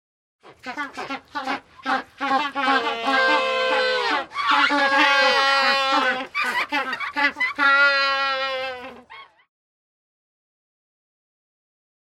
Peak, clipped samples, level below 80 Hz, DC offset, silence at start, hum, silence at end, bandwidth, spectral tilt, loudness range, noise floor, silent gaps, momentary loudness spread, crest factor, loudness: -4 dBFS; under 0.1%; -66 dBFS; under 0.1%; 0.45 s; none; 2.9 s; 16 kHz; -1.5 dB/octave; 7 LU; -45 dBFS; none; 15 LU; 18 dB; -20 LUFS